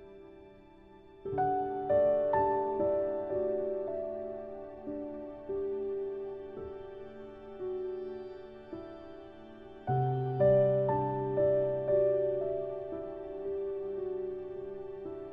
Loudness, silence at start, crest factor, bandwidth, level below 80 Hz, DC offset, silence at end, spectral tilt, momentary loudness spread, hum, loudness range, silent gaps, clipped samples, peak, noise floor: -33 LUFS; 0 s; 18 dB; 4.7 kHz; -60 dBFS; under 0.1%; 0 s; -11 dB/octave; 19 LU; none; 11 LU; none; under 0.1%; -16 dBFS; -55 dBFS